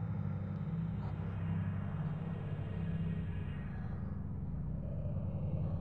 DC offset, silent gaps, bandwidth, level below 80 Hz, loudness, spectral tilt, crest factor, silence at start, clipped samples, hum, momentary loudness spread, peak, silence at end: 0.2%; none; 4.2 kHz; -50 dBFS; -40 LUFS; -11 dB/octave; 12 dB; 0 s; under 0.1%; 50 Hz at -65 dBFS; 4 LU; -26 dBFS; 0 s